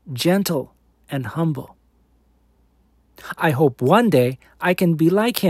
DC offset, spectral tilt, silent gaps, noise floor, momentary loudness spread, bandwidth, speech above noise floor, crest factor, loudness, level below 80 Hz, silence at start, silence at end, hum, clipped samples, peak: under 0.1%; -6 dB/octave; none; -59 dBFS; 15 LU; 16 kHz; 40 dB; 20 dB; -19 LUFS; -58 dBFS; 0.05 s; 0 s; none; under 0.1%; 0 dBFS